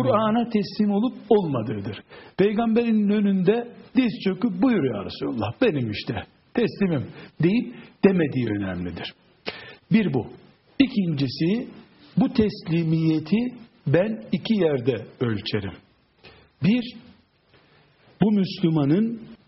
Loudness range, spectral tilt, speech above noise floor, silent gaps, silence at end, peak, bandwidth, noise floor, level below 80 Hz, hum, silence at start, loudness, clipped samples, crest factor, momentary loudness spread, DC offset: 4 LU; -6.5 dB/octave; 36 dB; none; 0.1 s; -2 dBFS; 6 kHz; -59 dBFS; -56 dBFS; none; 0 s; -23 LUFS; under 0.1%; 20 dB; 13 LU; under 0.1%